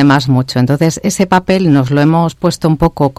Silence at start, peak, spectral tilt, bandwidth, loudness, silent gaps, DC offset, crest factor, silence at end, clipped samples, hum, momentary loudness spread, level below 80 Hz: 0 s; 0 dBFS; -6 dB/octave; 15 kHz; -12 LUFS; none; under 0.1%; 10 dB; 0.05 s; under 0.1%; none; 4 LU; -34 dBFS